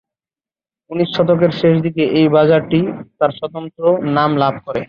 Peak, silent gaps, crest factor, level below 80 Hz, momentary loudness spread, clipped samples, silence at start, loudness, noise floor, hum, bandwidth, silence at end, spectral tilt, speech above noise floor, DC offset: -2 dBFS; none; 14 dB; -54 dBFS; 9 LU; under 0.1%; 0.9 s; -15 LUFS; under -90 dBFS; none; 6.8 kHz; 0.05 s; -9 dB/octave; over 75 dB; under 0.1%